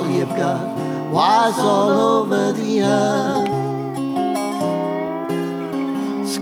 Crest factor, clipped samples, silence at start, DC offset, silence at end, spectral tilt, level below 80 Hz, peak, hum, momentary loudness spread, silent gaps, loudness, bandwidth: 14 dB; under 0.1%; 0 s; under 0.1%; 0 s; -5.5 dB/octave; -68 dBFS; -4 dBFS; none; 8 LU; none; -19 LUFS; 17.5 kHz